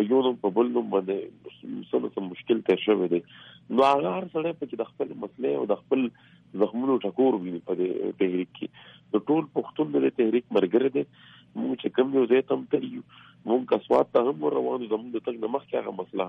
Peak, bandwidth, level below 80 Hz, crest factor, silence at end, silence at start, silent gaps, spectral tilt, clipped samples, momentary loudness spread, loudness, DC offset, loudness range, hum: -10 dBFS; 6.2 kHz; -74 dBFS; 16 dB; 0 s; 0 s; none; -8 dB/octave; under 0.1%; 11 LU; -26 LUFS; under 0.1%; 2 LU; none